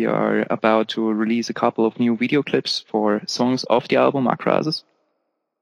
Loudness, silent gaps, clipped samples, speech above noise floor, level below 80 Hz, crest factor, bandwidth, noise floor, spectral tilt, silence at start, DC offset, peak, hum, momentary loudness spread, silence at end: -20 LUFS; none; under 0.1%; 54 dB; -70 dBFS; 18 dB; 11 kHz; -74 dBFS; -5.5 dB/octave; 0 s; under 0.1%; -2 dBFS; none; 4 LU; 0.8 s